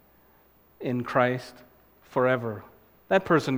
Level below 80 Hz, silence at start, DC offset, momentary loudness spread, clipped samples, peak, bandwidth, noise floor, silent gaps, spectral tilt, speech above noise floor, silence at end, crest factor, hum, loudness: -64 dBFS; 0.8 s; under 0.1%; 14 LU; under 0.1%; -6 dBFS; 16.5 kHz; -60 dBFS; none; -6.5 dB/octave; 35 dB; 0 s; 22 dB; none; -27 LUFS